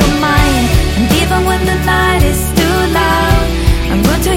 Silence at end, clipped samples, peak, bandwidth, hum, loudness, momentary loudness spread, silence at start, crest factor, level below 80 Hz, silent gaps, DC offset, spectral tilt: 0 s; under 0.1%; 0 dBFS; 16.5 kHz; none; -12 LUFS; 2 LU; 0 s; 10 dB; -16 dBFS; none; under 0.1%; -5 dB/octave